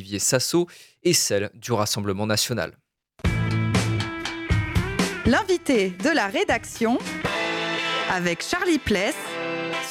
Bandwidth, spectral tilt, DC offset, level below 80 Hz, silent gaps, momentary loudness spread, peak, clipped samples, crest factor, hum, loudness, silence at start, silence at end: 17.5 kHz; -4 dB/octave; under 0.1%; -40 dBFS; none; 6 LU; -6 dBFS; under 0.1%; 18 dB; none; -23 LUFS; 0 s; 0 s